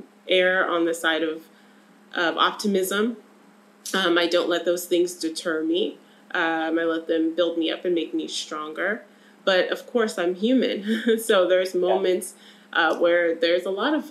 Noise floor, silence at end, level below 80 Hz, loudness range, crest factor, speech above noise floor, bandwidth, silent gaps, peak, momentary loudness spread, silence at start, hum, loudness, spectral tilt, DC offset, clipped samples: -53 dBFS; 0 s; -90 dBFS; 3 LU; 18 dB; 30 dB; 15 kHz; none; -6 dBFS; 8 LU; 0.25 s; none; -23 LUFS; -3.5 dB/octave; under 0.1%; under 0.1%